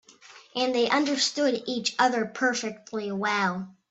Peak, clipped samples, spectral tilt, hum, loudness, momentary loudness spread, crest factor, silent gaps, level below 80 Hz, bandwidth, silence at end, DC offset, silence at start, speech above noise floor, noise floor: -8 dBFS; under 0.1%; -3 dB/octave; none; -26 LUFS; 10 LU; 18 dB; none; -74 dBFS; 8.4 kHz; 0.2 s; under 0.1%; 0.25 s; 25 dB; -52 dBFS